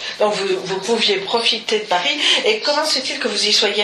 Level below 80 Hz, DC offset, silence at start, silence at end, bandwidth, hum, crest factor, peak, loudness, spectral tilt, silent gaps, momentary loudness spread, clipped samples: -66 dBFS; under 0.1%; 0 s; 0 s; 12.5 kHz; none; 16 dB; -2 dBFS; -17 LUFS; -1.5 dB/octave; none; 6 LU; under 0.1%